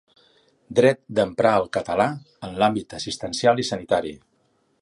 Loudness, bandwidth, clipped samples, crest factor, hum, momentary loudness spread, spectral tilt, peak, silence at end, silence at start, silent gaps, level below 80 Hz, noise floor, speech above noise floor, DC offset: -22 LUFS; 11.5 kHz; under 0.1%; 20 dB; none; 11 LU; -5 dB/octave; -4 dBFS; 0.65 s; 0.7 s; none; -56 dBFS; -66 dBFS; 44 dB; under 0.1%